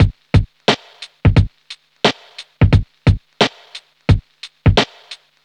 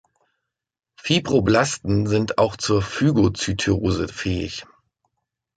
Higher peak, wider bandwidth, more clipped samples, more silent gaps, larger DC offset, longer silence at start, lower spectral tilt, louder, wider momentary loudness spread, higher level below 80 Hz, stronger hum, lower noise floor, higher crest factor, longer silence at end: first, 0 dBFS vs -4 dBFS; about the same, 9.6 kHz vs 9.4 kHz; neither; neither; neither; second, 0 s vs 1.05 s; about the same, -6 dB/octave vs -5.5 dB/octave; first, -17 LUFS vs -21 LUFS; first, 22 LU vs 8 LU; first, -26 dBFS vs -40 dBFS; neither; second, -40 dBFS vs -78 dBFS; about the same, 16 dB vs 18 dB; second, 0.3 s vs 0.95 s